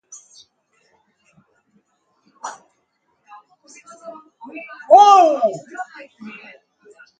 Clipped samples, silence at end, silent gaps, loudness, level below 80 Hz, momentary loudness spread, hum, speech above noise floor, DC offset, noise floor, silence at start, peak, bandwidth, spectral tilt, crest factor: under 0.1%; 0.9 s; none; -12 LUFS; -78 dBFS; 29 LU; none; 48 dB; under 0.1%; -67 dBFS; 2.45 s; 0 dBFS; 9.2 kHz; -3 dB/octave; 20 dB